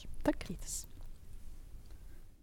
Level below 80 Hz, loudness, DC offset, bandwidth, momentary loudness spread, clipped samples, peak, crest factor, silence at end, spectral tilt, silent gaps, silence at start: -46 dBFS; -40 LUFS; under 0.1%; 19 kHz; 20 LU; under 0.1%; -16 dBFS; 26 dB; 0 s; -4.5 dB/octave; none; 0 s